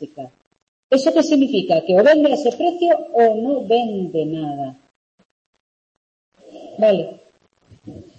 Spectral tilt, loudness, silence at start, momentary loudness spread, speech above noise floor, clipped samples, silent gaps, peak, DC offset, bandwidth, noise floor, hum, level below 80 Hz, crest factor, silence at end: -6 dB/octave; -17 LUFS; 0 s; 18 LU; 40 dB; under 0.1%; 0.47-0.51 s, 0.62-0.90 s, 4.96-5.18 s, 5.25-5.53 s, 5.60-6.32 s; -4 dBFS; under 0.1%; 8.6 kHz; -56 dBFS; none; -66 dBFS; 16 dB; 0.15 s